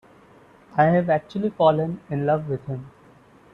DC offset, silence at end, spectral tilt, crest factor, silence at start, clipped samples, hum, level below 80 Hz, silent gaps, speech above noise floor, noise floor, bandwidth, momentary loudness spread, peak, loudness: under 0.1%; 0.65 s; -9 dB/octave; 18 dB; 0.75 s; under 0.1%; none; -60 dBFS; none; 30 dB; -52 dBFS; 6.4 kHz; 11 LU; -4 dBFS; -22 LUFS